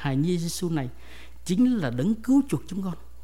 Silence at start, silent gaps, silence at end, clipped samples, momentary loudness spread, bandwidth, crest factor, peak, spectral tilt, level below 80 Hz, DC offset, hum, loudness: 0 s; none; 0 s; under 0.1%; 11 LU; 16 kHz; 14 dB; -12 dBFS; -6.5 dB/octave; -48 dBFS; 1%; none; -26 LUFS